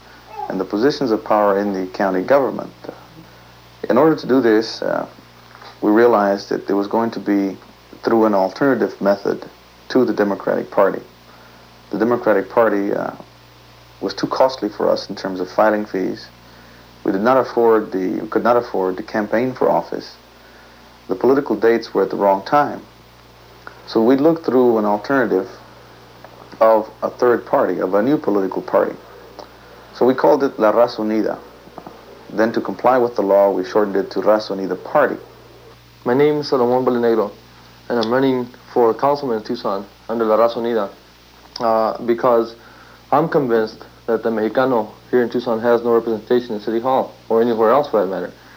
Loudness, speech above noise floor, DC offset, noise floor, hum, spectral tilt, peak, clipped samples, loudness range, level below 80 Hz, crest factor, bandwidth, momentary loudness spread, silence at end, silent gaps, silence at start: -18 LUFS; 29 dB; under 0.1%; -46 dBFS; none; -6.5 dB/octave; 0 dBFS; under 0.1%; 2 LU; -56 dBFS; 18 dB; 17 kHz; 12 LU; 0.25 s; none; 0.3 s